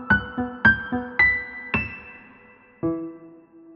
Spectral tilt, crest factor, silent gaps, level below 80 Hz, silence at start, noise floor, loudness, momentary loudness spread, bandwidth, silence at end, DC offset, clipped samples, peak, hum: -7.5 dB/octave; 22 dB; none; -44 dBFS; 0 s; -51 dBFS; -22 LUFS; 16 LU; 7 kHz; 0 s; under 0.1%; under 0.1%; -4 dBFS; none